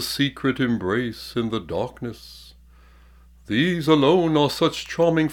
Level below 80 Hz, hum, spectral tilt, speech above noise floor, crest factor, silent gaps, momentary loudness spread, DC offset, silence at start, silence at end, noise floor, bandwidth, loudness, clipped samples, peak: -50 dBFS; none; -5.5 dB/octave; 29 dB; 18 dB; none; 13 LU; under 0.1%; 0 s; 0 s; -50 dBFS; 18 kHz; -22 LUFS; under 0.1%; -6 dBFS